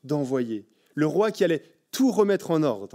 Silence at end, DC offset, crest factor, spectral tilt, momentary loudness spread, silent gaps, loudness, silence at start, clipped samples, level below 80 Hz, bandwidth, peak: 0.05 s; under 0.1%; 16 dB; -6 dB/octave; 12 LU; none; -24 LUFS; 0.05 s; under 0.1%; -80 dBFS; 16 kHz; -8 dBFS